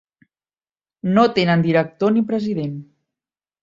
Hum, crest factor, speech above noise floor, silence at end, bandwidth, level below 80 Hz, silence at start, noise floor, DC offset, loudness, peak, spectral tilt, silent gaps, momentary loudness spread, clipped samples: none; 18 dB; over 72 dB; 0.8 s; 7.6 kHz; -60 dBFS; 1.05 s; under -90 dBFS; under 0.1%; -19 LUFS; -2 dBFS; -8 dB/octave; none; 12 LU; under 0.1%